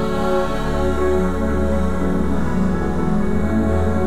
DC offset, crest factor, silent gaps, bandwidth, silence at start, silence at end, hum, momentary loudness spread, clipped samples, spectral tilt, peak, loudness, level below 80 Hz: 6%; 12 dB; none; 13.5 kHz; 0 s; 0 s; none; 2 LU; under 0.1%; -7.5 dB/octave; -6 dBFS; -20 LUFS; -28 dBFS